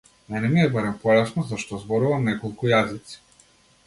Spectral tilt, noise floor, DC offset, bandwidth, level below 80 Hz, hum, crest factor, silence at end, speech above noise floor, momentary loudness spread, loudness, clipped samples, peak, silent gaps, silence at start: -6.5 dB/octave; -57 dBFS; under 0.1%; 11.5 kHz; -56 dBFS; none; 18 dB; 0.7 s; 35 dB; 12 LU; -23 LUFS; under 0.1%; -4 dBFS; none; 0.3 s